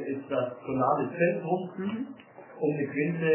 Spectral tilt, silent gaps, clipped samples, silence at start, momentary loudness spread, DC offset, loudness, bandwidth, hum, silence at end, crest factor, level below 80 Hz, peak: -11 dB/octave; none; under 0.1%; 0 s; 11 LU; under 0.1%; -30 LUFS; 3.2 kHz; none; 0 s; 18 dB; -70 dBFS; -12 dBFS